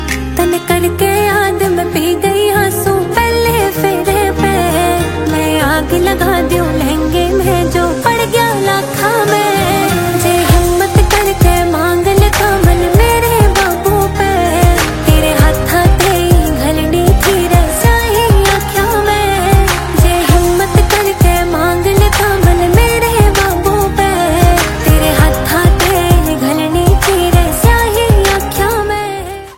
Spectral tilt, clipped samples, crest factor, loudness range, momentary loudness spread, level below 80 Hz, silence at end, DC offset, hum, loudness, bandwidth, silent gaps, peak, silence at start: -5 dB/octave; 0.2%; 10 dB; 2 LU; 4 LU; -16 dBFS; 0 s; under 0.1%; none; -11 LUFS; 17 kHz; none; 0 dBFS; 0 s